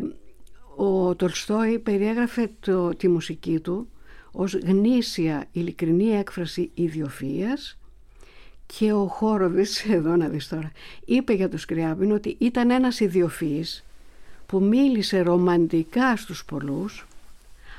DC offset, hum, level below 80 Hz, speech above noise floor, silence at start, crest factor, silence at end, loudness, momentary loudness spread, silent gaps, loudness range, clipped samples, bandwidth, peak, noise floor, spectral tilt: under 0.1%; none; -50 dBFS; 24 dB; 0 s; 16 dB; 0 s; -24 LUFS; 12 LU; none; 4 LU; under 0.1%; 15 kHz; -8 dBFS; -47 dBFS; -6.5 dB/octave